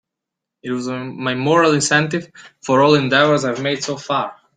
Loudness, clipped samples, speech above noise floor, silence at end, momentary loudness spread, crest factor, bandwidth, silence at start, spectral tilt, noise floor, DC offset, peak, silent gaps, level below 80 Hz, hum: -17 LUFS; under 0.1%; 65 dB; 0.25 s; 13 LU; 16 dB; 9.6 kHz; 0.65 s; -4.5 dB/octave; -83 dBFS; under 0.1%; -2 dBFS; none; -60 dBFS; none